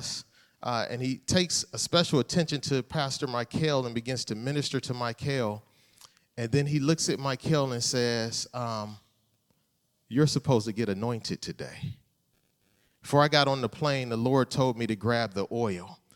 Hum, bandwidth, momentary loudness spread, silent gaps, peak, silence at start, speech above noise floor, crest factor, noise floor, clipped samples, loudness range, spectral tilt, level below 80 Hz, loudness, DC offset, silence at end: none; 17 kHz; 12 LU; none; -6 dBFS; 0 s; 45 dB; 22 dB; -74 dBFS; under 0.1%; 4 LU; -4.5 dB/octave; -62 dBFS; -28 LUFS; under 0.1%; 0.2 s